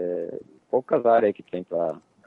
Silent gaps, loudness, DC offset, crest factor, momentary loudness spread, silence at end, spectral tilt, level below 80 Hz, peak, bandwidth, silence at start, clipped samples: none; -24 LUFS; under 0.1%; 16 dB; 15 LU; 0.3 s; -9 dB/octave; -70 dBFS; -8 dBFS; 4.2 kHz; 0 s; under 0.1%